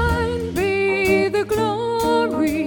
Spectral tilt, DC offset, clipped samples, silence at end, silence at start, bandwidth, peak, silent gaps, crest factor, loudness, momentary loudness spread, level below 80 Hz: -5.5 dB/octave; under 0.1%; under 0.1%; 0 s; 0 s; 19 kHz; -6 dBFS; none; 12 dB; -20 LUFS; 4 LU; -34 dBFS